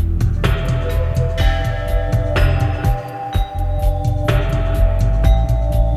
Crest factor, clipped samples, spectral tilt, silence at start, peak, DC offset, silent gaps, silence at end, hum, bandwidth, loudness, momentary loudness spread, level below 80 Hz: 14 dB; under 0.1%; -7 dB/octave; 0 s; -2 dBFS; under 0.1%; none; 0 s; none; 14 kHz; -18 LUFS; 5 LU; -18 dBFS